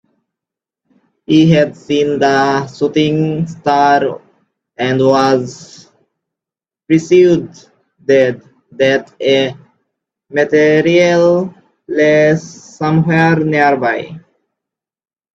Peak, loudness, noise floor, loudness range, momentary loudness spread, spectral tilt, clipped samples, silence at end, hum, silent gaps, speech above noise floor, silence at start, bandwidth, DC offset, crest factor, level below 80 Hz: 0 dBFS; -13 LUFS; under -90 dBFS; 3 LU; 11 LU; -6.5 dB/octave; under 0.1%; 1.15 s; none; none; over 78 dB; 1.3 s; 8 kHz; under 0.1%; 14 dB; -54 dBFS